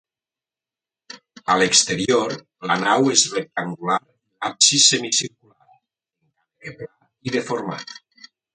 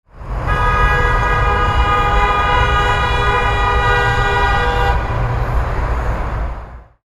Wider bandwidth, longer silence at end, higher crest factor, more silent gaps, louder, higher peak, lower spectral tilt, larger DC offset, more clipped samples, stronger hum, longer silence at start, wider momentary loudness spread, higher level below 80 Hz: second, 9.6 kHz vs 12.5 kHz; first, 0.6 s vs 0.2 s; first, 22 dB vs 14 dB; neither; second, -18 LUFS vs -15 LUFS; about the same, 0 dBFS vs 0 dBFS; second, -1.5 dB/octave vs -5.5 dB/octave; neither; neither; neither; first, 1.15 s vs 0.15 s; first, 22 LU vs 8 LU; second, -64 dBFS vs -20 dBFS